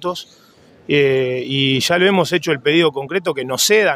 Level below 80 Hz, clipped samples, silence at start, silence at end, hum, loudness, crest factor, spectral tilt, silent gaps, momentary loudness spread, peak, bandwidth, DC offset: -60 dBFS; under 0.1%; 0 s; 0 s; none; -16 LUFS; 16 dB; -3.5 dB/octave; none; 7 LU; 0 dBFS; 16 kHz; under 0.1%